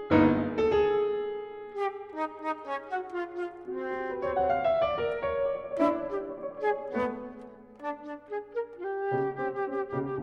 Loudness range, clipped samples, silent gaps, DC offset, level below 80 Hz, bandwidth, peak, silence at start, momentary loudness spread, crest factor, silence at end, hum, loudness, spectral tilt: 5 LU; under 0.1%; none; under 0.1%; -56 dBFS; 7 kHz; -10 dBFS; 0 s; 13 LU; 20 dB; 0 s; 60 Hz at -65 dBFS; -31 LUFS; -8 dB/octave